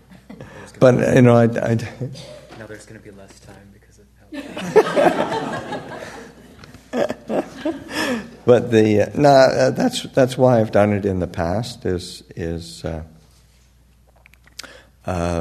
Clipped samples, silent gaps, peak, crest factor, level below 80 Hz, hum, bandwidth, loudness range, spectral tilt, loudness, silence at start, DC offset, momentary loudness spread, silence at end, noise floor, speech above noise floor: under 0.1%; none; 0 dBFS; 20 dB; -48 dBFS; none; 13.5 kHz; 13 LU; -6.5 dB/octave; -18 LUFS; 0.3 s; under 0.1%; 24 LU; 0 s; -53 dBFS; 35 dB